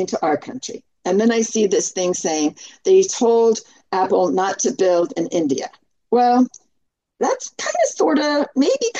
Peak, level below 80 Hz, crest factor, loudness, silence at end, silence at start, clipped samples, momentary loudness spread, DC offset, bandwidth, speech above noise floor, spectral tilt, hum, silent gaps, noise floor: -6 dBFS; -70 dBFS; 14 dB; -19 LUFS; 0 s; 0 s; under 0.1%; 10 LU; under 0.1%; 8.8 kHz; 53 dB; -3.5 dB/octave; none; none; -71 dBFS